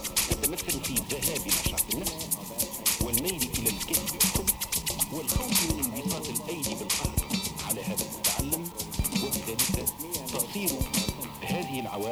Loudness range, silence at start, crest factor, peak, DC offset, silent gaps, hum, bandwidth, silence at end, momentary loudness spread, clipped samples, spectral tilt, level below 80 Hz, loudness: 3 LU; 0 s; 20 dB; -10 dBFS; under 0.1%; none; none; over 20 kHz; 0 s; 7 LU; under 0.1%; -2.5 dB/octave; -42 dBFS; -28 LUFS